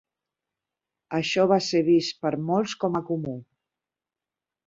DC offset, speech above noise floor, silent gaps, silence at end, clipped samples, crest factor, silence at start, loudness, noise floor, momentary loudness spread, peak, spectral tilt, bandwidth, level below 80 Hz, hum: under 0.1%; 66 dB; none; 1.25 s; under 0.1%; 20 dB; 1.1 s; -24 LUFS; -90 dBFS; 10 LU; -8 dBFS; -5.5 dB/octave; 7.8 kHz; -66 dBFS; none